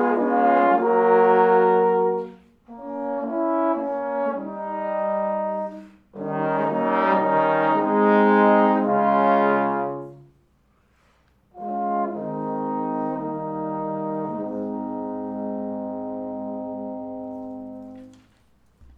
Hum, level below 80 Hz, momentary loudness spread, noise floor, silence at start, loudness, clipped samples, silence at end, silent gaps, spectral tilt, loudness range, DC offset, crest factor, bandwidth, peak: none; -64 dBFS; 17 LU; -62 dBFS; 0 s; -22 LUFS; under 0.1%; 0.9 s; none; -9 dB/octave; 11 LU; under 0.1%; 18 dB; 5.2 kHz; -6 dBFS